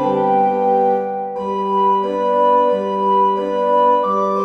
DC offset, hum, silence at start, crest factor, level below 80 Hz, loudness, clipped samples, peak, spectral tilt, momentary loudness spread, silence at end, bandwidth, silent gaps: under 0.1%; none; 0 s; 12 dB; -56 dBFS; -16 LUFS; under 0.1%; -4 dBFS; -7.5 dB/octave; 6 LU; 0 s; 6.2 kHz; none